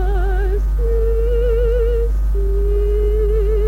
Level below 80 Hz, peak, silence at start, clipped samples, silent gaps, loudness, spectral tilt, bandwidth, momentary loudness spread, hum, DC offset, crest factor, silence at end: -16 dBFS; -8 dBFS; 0 s; under 0.1%; none; -19 LUFS; -8.5 dB/octave; 3.2 kHz; 3 LU; none; under 0.1%; 8 dB; 0 s